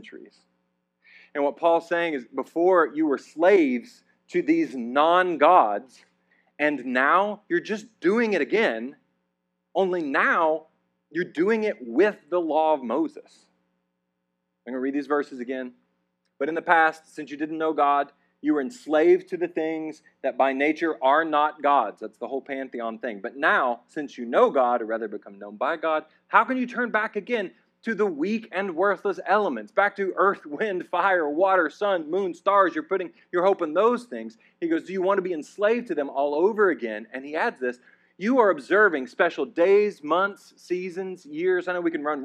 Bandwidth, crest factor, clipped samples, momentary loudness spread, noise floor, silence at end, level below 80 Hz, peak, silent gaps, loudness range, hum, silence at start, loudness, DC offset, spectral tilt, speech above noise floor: 9.8 kHz; 20 dB; under 0.1%; 13 LU; -78 dBFS; 0 s; -86 dBFS; -4 dBFS; none; 4 LU; none; 0.05 s; -24 LUFS; under 0.1%; -5.5 dB/octave; 54 dB